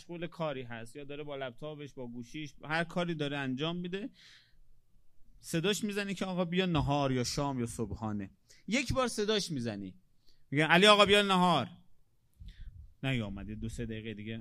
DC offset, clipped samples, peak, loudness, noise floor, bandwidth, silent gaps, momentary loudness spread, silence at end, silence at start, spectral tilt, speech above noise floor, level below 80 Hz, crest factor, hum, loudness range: under 0.1%; under 0.1%; -8 dBFS; -31 LUFS; -61 dBFS; 15 kHz; none; 20 LU; 0 s; 0 s; -4.5 dB/octave; 29 dB; -54 dBFS; 26 dB; none; 10 LU